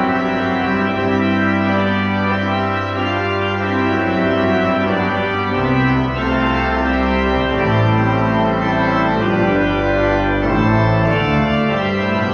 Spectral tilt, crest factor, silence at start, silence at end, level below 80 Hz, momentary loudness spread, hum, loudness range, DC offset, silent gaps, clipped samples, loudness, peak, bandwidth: -7.5 dB/octave; 14 dB; 0 s; 0 s; -32 dBFS; 3 LU; none; 2 LU; under 0.1%; none; under 0.1%; -16 LUFS; -2 dBFS; 6.8 kHz